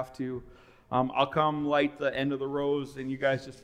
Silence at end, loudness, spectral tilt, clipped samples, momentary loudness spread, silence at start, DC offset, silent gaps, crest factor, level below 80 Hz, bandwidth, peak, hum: 0.05 s; -29 LUFS; -6.5 dB/octave; under 0.1%; 10 LU; 0 s; under 0.1%; none; 20 dB; -60 dBFS; 11 kHz; -10 dBFS; none